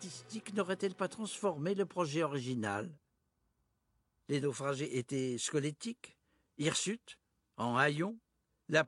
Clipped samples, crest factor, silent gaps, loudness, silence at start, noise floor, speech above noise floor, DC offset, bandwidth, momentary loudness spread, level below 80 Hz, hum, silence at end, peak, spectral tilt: under 0.1%; 24 dB; none; -36 LUFS; 0 s; -80 dBFS; 44 dB; under 0.1%; 12 kHz; 12 LU; -78 dBFS; none; 0 s; -14 dBFS; -4.5 dB/octave